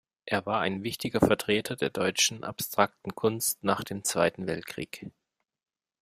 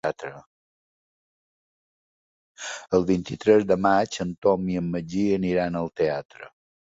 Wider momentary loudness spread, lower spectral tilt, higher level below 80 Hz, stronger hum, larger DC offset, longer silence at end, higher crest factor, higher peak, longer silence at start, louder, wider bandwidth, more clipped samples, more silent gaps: second, 10 LU vs 15 LU; second, -3.5 dB/octave vs -6 dB/octave; second, -60 dBFS vs -54 dBFS; neither; neither; first, 0.9 s vs 0.4 s; about the same, 24 dB vs 20 dB; about the same, -6 dBFS vs -4 dBFS; first, 0.25 s vs 0.05 s; second, -28 LUFS vs -24 LUFS; first, 16 kHz vs 8 kHz; neither; second, none vs 0.46-2.55 s, 6.25-6.29 s